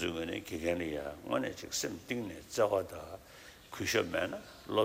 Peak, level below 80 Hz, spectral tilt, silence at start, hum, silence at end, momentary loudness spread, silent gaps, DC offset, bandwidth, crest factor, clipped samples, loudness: -16 dBFS; -60 dBFS; -3.5 dB/octave; 0 s; none; 0 s; 16 LU; none; under 0.1%; 16 kHz; 20 dB; under 0.1%; -36 LUFS